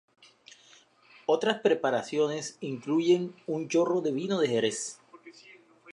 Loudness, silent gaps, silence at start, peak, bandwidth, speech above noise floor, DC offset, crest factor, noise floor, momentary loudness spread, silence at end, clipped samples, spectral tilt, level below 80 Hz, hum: -28 LUFS; none; 1.3 s; -10 dBFS; 11 kHz; 31 dB; under 0.1%; 20 dB; -59 dBFS; 11 LU; 0 s; under 0.1%; -4.5 dB/octave; -82 dBFS; none